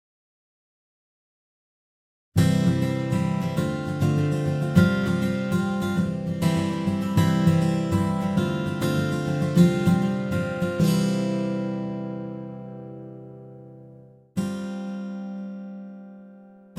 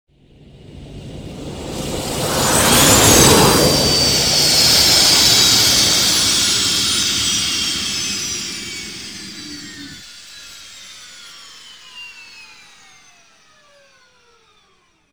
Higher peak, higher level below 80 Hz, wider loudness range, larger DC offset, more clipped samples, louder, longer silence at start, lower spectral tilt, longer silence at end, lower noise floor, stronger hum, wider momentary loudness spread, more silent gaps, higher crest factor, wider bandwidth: second, -4 dBFS vs 0 dBFS; second, -52 dBFS vs -38 dBFS; second, 12 LU vs 20 LU; second, under 0.1% vs 0.2%; neither; second, -24 LUFS vs -12 LUFS; first, 2.35 s vs 0.65 s; first, -7 dB/octave vs -2 dB/octave; second, 0 s vs 2.65 s; second, -49 dBFS vs -57 dBFS; neither; second, 18 LU vs 25 LU; neither; about the same, 20 dB vs 18 dB; second, 15 kHz vs over 20 kHz